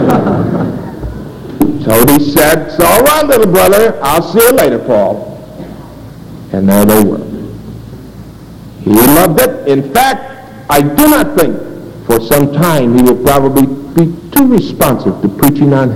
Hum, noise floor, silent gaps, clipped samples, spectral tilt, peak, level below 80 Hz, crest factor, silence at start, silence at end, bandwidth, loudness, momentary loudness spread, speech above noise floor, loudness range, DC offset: none; -30 dBFS; none; 0.8%; -5.5 dB/octave; 0 dBFS; -32 dBFS; 10 dB; 0 s; 0 s; over 20 kHz; -9 LUFS; 21 LU; 22 dB; 5 LU; 2%